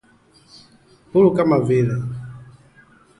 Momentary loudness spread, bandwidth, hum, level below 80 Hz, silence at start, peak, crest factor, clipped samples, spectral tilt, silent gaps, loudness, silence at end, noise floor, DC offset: 17 LU; 11 kHz; none; -54 dBFS; 1.15 s; -4 dBFS; 18 dB; under 0.1%; -9 dB/octave; none; -18 LUFS; 0.75 s; -54 dBFS; under 0.1%